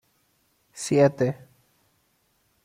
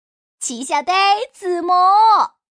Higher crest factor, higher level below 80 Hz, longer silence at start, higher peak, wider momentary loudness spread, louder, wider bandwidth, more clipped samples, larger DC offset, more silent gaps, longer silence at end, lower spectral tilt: first, 20 dB vs 12 dB; about the same, -68 dBFS vs -72 dBFS; first, 0.75 s vs 0.4 s; second, -8 dBFS vs -4 dBFS; first, 21 LU vs 13 LU; second, -23 LUFS vs -15 LUFS; first, 15 kHz vs 10.5 kHz; neither; neither; neither; first, 1.3 s vs 0.3 s; first, -6 dB/octave vs -0.5 dB/octave